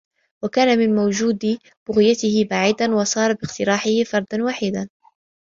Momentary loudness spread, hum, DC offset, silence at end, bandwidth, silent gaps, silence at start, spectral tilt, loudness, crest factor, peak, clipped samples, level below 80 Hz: 8 LU; none; under 0.1%; 0.6 s; 7.6 kHz; 1.77-1.86 s; 0.4 s; -4.5 dB/octave; -19 LUFS; 16 dB; -4 dBFS; under 0.1%; -58 dBFS